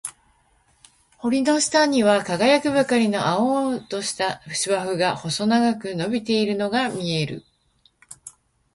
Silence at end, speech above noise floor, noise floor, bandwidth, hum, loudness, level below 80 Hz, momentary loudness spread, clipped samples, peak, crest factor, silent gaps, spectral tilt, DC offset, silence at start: 0.45 s; 41 dB; -62 dBFS; 11.5 kHz; none; -21 LUFS; -60 dBFS; 10 LU; under 0.1%; -4 dBFS; 18 dB; none; -4 dB/octave; under 0.1%; 0.05 s